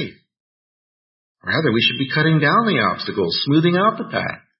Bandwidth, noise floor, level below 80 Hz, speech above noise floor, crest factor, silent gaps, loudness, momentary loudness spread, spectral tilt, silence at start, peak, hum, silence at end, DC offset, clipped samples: 5.8 kHz; under -90 dBFS; -60 dBFS; over 72 dB; 16 dB; 0.40-1.35 s; -18 LUFS; 9 LU; -10 dB/octave; 0 s; -4 dBFS; none; 0.2 s; under 0.1%; under 0.1%